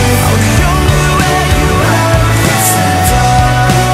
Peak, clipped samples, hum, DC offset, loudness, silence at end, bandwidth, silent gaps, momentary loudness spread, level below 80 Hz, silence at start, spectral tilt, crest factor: 0 dBFS; 0.1%; none; under 0.1%; -9 LUFS; 0 s; 16.5 kHz; none; 1 LU; -18 dBFS; 0 s; -4.5 dB/octave; 8 dB